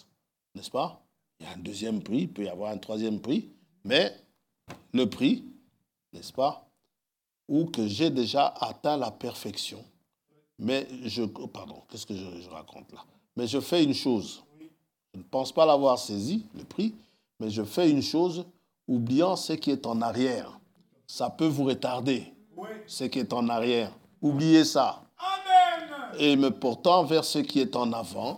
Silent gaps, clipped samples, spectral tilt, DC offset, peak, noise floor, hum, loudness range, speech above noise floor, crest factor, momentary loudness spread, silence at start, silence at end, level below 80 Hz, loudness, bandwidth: none; under 0.1%; -5 dB/octave; under 0.1%; -8 dBFS; -87 dBFS; none; 9 LU; 60 dB; 20 dB; 19 LU; 0.55 s; 0 s; -76 dBFS; -27 LUFS; 17 kHz